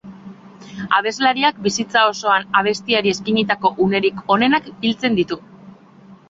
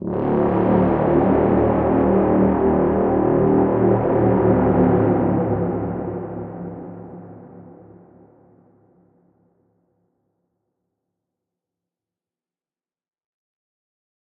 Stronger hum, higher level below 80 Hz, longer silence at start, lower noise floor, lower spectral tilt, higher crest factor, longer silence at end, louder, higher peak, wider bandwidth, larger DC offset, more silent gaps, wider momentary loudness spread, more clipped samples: neither; second, -58 dBFS vs -42 dBFS; about the same, 0.05 s vs 0 s; second, -45 dBFS vs under -90 dBFS; second, -4 dB/octave vs -13 dB/octave; about the same, 18 dB vs 16 dB; second, 0.15 s vs 6.6 s; about the same, -17 LUFS vs -18 LUFS; first, 0 dBFS vs -4 dBFS; first, 7.8 kHz vs 3.6 kHz; neither; neither; second, 7 LU vs 15 LU; neither